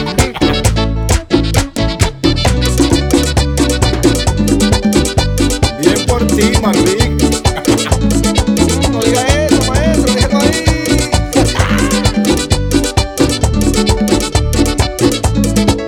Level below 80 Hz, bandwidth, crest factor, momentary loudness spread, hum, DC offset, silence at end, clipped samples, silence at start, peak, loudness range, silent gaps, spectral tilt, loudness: -18 dBFS; 18.5 kHz; 12 dB; 3 LU; none; under 0.1%; 0 s; under 0.1%; 0 s; 0 dBFS; 1 LU; none; -5 dB/octave; -12 LUFS